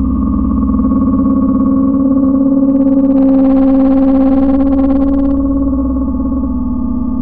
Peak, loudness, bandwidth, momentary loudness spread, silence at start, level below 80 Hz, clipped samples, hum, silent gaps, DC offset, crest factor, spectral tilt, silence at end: -2 dBFS; -11 LUFS; 2.9 kHz; 7 LU; 0 s; -22 dBFS; under 0.1%; none; none; under 0.1%; 8 dB; -14 dB/octave; 0 s